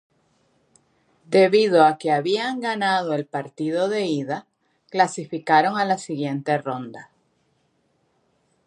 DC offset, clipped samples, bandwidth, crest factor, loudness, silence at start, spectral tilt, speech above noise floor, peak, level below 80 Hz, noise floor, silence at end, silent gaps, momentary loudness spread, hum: under 0.1%; under 0.1%; 11 kHz; 20 dB; -21 LUFS; 1.3 s; -5 dB/octave; 46 dB; -2 dBFS; -76 dBFS; -67 dBFS; 1.65 s; none; 14 LU; none